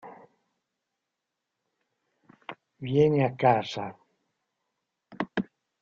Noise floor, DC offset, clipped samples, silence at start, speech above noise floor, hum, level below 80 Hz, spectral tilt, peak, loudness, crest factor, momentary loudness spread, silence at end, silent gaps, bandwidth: -85 dBFS; under 0.1%; under 0.1%; 0.05 s; 61 dB; none; -66 dBFS; -6 dB/octave; -8 dBFS; -26 LUFS; 24 dB; 22 LU; 0.4 s; none; 7.4 kHz